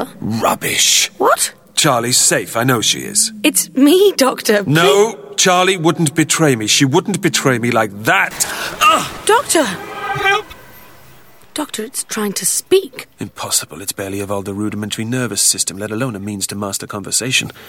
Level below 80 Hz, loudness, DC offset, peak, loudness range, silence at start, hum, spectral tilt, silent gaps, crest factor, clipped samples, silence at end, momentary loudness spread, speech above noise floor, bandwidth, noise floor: -54 dBFS; -14 LUFS; under 0.1%; 0 dBFS; 6 LU; 0 s; none; -3 dB/octave; none; 16 dB; under 0.1%; 0 s; 11 LU; 30 dB; 19 kHz; -45 dBFS